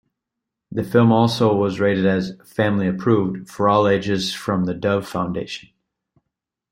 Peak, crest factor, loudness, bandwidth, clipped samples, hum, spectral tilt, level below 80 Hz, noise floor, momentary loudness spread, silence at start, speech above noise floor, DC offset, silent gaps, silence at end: -2 dBFS; 18 dB; -20 LUFS; 16 kHz; under 0.1%; none; -6.5 dB/octave; -56 dBFS; -83 dBFS; 12 LU; 0.7 s; 64 dB; under 0.1%; none; 1.1 s